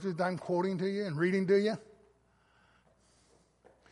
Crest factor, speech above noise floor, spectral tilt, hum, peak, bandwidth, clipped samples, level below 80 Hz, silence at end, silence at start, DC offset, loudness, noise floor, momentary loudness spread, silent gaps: 18 dB; 38 dB; -7 dB/octave; none; -16 dBFS; 11.5 kHz; under 0.1%; -74 dBFS; 2.1 s; 0 s; under 0.1%; -32 LUFS; -68 dBFS; 7 LU; none